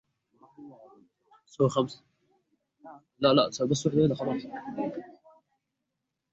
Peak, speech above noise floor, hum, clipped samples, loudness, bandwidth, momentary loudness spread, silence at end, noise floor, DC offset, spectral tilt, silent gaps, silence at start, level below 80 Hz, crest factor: -8 dBFS; 57 dB; none; under 0.1%; -28 LUFS; 8 kHz; 16 LU; 1.2 s; -84 dBFS; under 0.1%; -6 dB/octave; none; 0.6 s; -66 dBFS; 22 dB